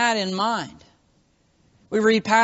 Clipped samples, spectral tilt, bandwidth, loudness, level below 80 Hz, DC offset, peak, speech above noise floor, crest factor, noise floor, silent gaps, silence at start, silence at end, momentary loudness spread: under 0.1%; -2.5 dB/octave; 8 kHz; -22 LUFS; -64 dBFS; under 0.1%; -4 dBFS; 42 dB; 18 dB; -63 dBFS; none; 0 s; 0 s; 10 LU